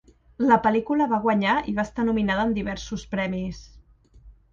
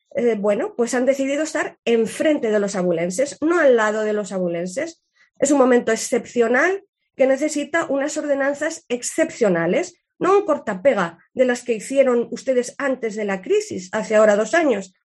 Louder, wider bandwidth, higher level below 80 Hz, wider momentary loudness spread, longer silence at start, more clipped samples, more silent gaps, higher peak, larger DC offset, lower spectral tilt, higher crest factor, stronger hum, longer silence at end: second, -24 LUFS vs -20 LUFS; second, 7.4 kHz vs 12 kHz; first, -46 dBFS vs -68 dBFS; first, 11 LU vs 8 LU; first, 0.4 s vs 0.15 s; neither; second, none vs 1.79-1.83 s, 6.89-6.93 s; about the same, -6 dBFS vs -4 dBFS; neither; first, -6.5 dB/octave vs -4.5 dB/octave; about the same, 20 dB vs 16 dB; neither; about the same, 0.2 s vs 0.2 s